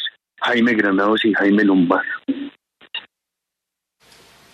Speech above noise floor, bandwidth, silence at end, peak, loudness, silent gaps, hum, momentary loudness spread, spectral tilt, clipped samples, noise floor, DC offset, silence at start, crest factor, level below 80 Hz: 66 dB; 8 kHz; 1.55 s; -4 dBFS; -17 LUFS; none; none; 16 LU; -6.5 dB/octave; under 0.1%; -83 dBFS; under 0.1%; 0 s; 16 dB; -66 dBFS